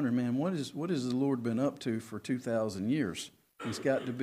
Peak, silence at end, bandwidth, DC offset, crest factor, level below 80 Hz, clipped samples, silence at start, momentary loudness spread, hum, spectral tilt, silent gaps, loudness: -16 dBFS; 0 s; 15.5 kHz; under 0.1%; 16 dB; -74 dBFS; under 0.1%; 0 s; 7 LU; none; -6 dB/octave; none; -33 LUFS